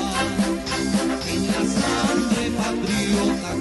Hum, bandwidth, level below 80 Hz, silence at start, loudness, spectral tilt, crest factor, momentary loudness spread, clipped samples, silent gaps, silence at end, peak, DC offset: none; 12 kHz; -40 dBFS; 0 s; -22 LUFS; -4.5 dB/octave; 14 dB; 3 LU; under 0.1%; none; 0 s; -8 dBFS; under 0.1%